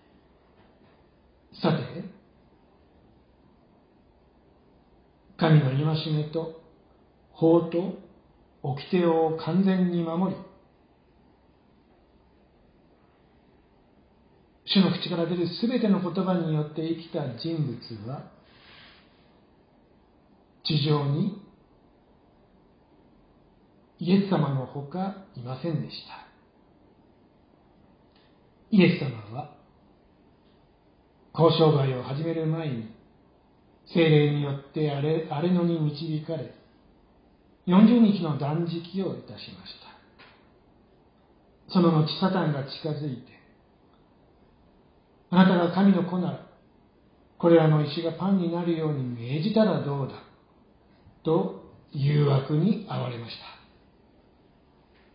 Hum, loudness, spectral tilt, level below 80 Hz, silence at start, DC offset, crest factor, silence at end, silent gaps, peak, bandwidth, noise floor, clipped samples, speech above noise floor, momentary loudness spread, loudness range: none; -25 LUFS; -11.5 dB/octave; -66 dBFS; 1.55 s; under 0.1%; 22 dB; 1.6 s; none; -6 dBFS; 5.2 kHz; -60 dBFS; under 0.1%; 36 dB; 18 LU; 11 LU